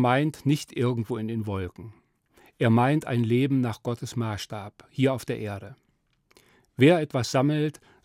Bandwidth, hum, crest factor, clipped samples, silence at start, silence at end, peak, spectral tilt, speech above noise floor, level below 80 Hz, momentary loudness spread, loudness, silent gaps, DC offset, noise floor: 16 kHz; none; 20 dB; under 0.1%; 0 s; 0.35 s; -6 dBFS; -6.5 dB/octave; 42 dB; -66 dBFS; 15 LU; -26 LUFS; none; under 0.1%; -67 dBFS